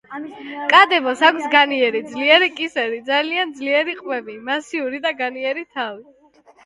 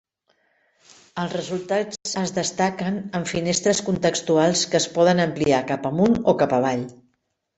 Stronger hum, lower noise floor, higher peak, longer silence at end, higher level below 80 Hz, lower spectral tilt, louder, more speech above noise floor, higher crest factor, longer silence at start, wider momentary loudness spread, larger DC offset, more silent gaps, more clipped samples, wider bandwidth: neither; second, -51 dBFS vs -72 dBFS; first, 0 dBFS vs -4 dBFS; about the same, 0.65 s vs 0.65 s; second, -70 dBFS vs -56 dBFS; second, -2.5 dB/octave vs -4.5 dB/octave; first, -18 LUFS vs -22 LUFS; second, 33 dB vs 51 dB; about the same, 20 dB vs 18 dB; second, 0.1 s vs 1.15 s; first, 14 LU vs 9 LU; neither; neither; neither; first, 11.5 kHz vs 8.4 kHz